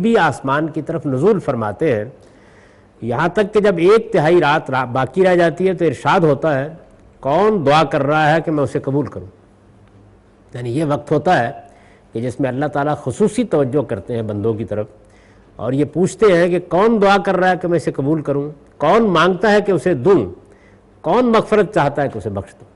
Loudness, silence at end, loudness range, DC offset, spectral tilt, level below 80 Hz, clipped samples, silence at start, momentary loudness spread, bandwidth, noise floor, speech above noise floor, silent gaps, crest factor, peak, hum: -16 LUFS; 0.3 s; 5 LU; under 0.1%; -6.5 dB/octave; -48 dBFS; under 0.1%; 0 s; 12 LU; 11.5 kHz; -47 dBFS; 32 dB; none; 12 dB; -4 dBFS; none